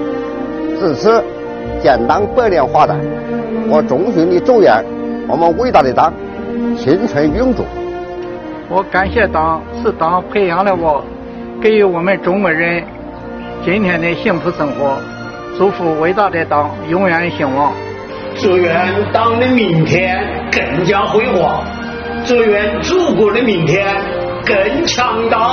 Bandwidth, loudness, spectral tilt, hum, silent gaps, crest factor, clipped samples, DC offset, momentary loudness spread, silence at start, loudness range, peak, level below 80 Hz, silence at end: 6.8 kHz; -13 LUFS; -4.5 dB/octave; none; none; 14 dB; under 0.1%; under 0.1%; 11 LU; 0 s; 3 LU; 0 dBFS; -36 dBFS; 0 s